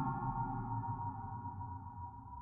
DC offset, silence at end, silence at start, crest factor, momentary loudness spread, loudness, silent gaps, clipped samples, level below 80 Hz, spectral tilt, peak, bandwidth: under 0.1%; 0 s; 0 s; 14 dB; 10 LU; -43 LUFS; none; under 0.1%; -56 dBFS; -12 dB/octave; -26 dBFS; 2.6 kHz